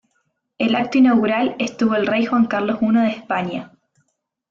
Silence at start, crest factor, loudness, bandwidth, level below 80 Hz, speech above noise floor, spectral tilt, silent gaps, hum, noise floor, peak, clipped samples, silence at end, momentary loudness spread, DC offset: 0.6 s; 14 dB; -18 LUFS; 7.2 kHz; -62 dBFS; 53 dB; -6 dB/octave; none; none; -70 dBFS; -6 dBFS; under 0.1%; 0.85 s; 9 LU; under 0.1%